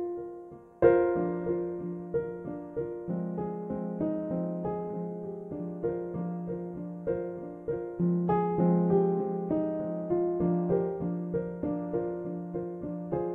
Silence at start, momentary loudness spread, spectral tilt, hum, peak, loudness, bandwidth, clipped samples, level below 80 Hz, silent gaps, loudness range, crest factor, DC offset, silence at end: 0 s; 12 LU; -12 dB/octave; none; -10 dBFS; -31 LUFS; 3 kHz; under 0.1%; -58 dBFS; none; 6 LU; 20 dB; under 0.1%; 0 s